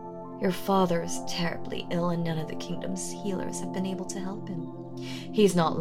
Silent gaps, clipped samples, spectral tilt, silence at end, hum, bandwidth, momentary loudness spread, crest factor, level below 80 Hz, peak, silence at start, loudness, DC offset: none; under 0.1%; -5.5 dB/octave; 0 s; none; 16 kHz; 13 LU; 20 dB; -58 dBFS; -10 dBFS; 0 s; -30 LUFS; under 0.1%